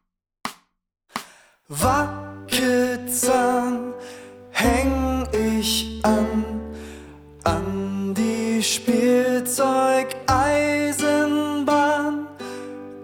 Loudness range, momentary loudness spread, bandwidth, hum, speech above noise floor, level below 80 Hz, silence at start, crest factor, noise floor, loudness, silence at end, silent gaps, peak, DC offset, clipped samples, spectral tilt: 4 LU; 16 LU; over 20 kHz; none; 49 dB; -40 dBFS; 0.45 s; 18 dB; -70 dBFS; -21 LUFS; 0 s; none; -4 dBFS; under 0.1%; under 0.1%; -4 dB/octave